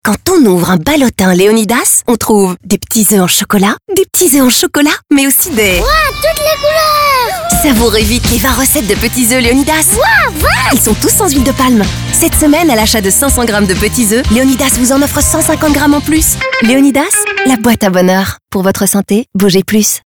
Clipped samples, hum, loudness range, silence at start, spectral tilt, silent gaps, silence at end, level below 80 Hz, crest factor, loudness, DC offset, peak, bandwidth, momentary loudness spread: under 0.1%; none; 1 LU; 0.05 s; -3.5 dB/octave; none; 0.1 s; -24 dBFS; 8 dB; -8 LUFS; under 0.1%; 0 dBFS; over 20 kHz; 3 LU